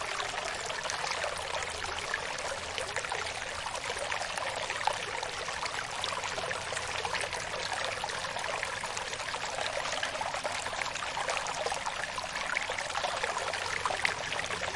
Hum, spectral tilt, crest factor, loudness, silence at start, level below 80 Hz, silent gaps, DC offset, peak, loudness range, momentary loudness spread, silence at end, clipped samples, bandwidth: none; -1 dB/octave; 22 dB; -33 LUFS; 0 s; -58 dBFS; none; under 0.1%; -12 dBFS; 2 LU; 3 LU; 0 s; under 0.1%; 11.5 kHz